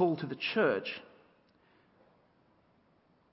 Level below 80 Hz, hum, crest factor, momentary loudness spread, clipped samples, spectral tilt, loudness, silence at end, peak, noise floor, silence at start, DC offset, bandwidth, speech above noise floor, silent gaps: -80 dBFS; none; 20 dB; 12 LU; under 0.1%; -3.5 dB/octave; -32 LUFS; 2.3 s; -16 dBFS; -69 dBFS; 0 s; under 0.1%; 5.6 kHz; 37 dB; none